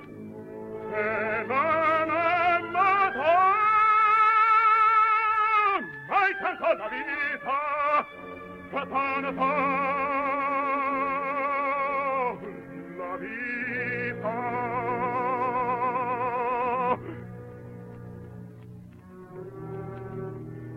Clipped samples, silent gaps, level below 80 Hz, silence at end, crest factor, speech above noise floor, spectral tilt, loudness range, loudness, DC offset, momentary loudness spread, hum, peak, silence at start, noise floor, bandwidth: under 0.1%; none; -62 dBFS; 0 s; 16 dB; 18 dB; -7 dB/octave; 11 LU; -25 LUFS; under 0.1%; 21 LU; none; -10 dBFS; 0 s; -46 dBFS; 7.2 kHz